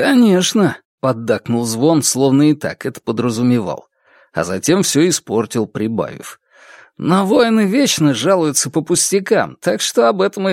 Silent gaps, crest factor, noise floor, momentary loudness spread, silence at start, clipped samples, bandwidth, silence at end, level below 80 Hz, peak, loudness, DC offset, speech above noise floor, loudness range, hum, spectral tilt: 0.85-0.98 s; 14 dB; -44 dBFS; 10 LU; 0 s; under 0.1%; 16.5 kHz; 0 s; -58 dBFS; 0 dBFS; -15 LUFS; under 0.1%; 29 dB; 3 LU; none; -4.5 dB/octave